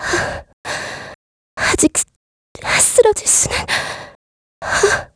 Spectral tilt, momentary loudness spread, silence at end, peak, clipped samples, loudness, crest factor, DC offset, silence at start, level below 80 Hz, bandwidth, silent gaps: -2 dB/octave; 18 LU; 0.1 s; 0 dBFS; under 0.1%; -15 LUFS; 18 dB; under 0.1%; 0 s; -40 dBFS; 11 kHz; 0.53-0.64 s, 1.15-1.57 s, 2.16-2.55 s, 4.15-4.62 s